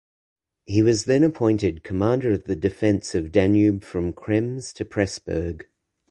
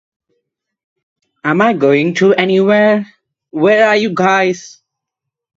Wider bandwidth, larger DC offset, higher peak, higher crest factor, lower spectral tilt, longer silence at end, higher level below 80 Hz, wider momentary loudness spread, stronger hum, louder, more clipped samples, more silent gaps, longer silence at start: first, 11 kHz vs 7.8 kHz; neither; second, -4 dBFS vs 0 dBFS; about the same, 18 dB vs 14 dB; about the same, -6.5 dB/octave vs -6 dB/octave; second, 0.5 s vs 0.9 s; first, -44 dBFS vs -62 dBFS; about the same, 9 LU vs 10 LU; neither; second, -22 LUFS vs -12 LUFS; neither; neither; second, 0.7 s vs 1.45 s